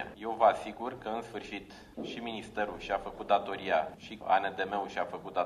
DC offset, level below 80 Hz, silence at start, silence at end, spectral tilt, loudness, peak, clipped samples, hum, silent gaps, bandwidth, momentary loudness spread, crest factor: under 0.1%; -62 dBFS; 0 s; 0 s; -5 dB/octave; -33 LUFS; -12 dBFS; under 0.1%; none; none; 12.5 kHz; 14 LU; 22 dB